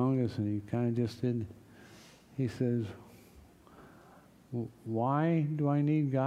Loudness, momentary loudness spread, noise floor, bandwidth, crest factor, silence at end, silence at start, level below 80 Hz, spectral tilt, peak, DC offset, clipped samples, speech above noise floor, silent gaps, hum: -33 LUFS; 15 LU; -58 dBFS; 12 kHz; 16 dB; 0 s; 0 s; -68 dBFS; -9 dB/octave; -16 dBFS; under 0.1%; under 0.1%; 27 dB; none; none